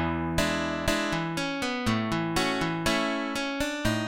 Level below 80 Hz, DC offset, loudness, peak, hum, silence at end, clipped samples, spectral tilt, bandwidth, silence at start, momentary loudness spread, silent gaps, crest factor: -44 dBFS; 0.1%; -28 LUFS; -10 dBFS; none; 0 s; under 0.1%; -4.5 dB/octave; 17 kHz; 0 s; 3 LU; none; 18 dB